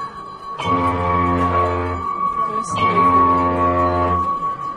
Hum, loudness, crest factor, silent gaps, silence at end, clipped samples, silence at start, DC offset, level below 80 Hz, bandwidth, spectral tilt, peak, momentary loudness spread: none; -18 LUFS; 14 dB; none; 0 s; under 0.1%; 0 s; under 0.1%; -40 dBFS; 11 kHz; -6.5 dB/octave; -4 dBFS; 9 LU